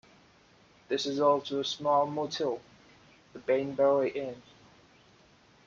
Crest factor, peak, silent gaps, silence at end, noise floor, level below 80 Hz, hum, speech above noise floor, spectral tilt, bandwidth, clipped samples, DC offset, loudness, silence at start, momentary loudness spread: 18 dB; -14 dBFS; none; 1.25 s; -61 dBFS; -74 dBFS; none; 32 dB; -4.5 dB/octave; 7.6 kHz; under 0.1%; under 0.1%; -30 LUFS; 0.9 s; 15 LU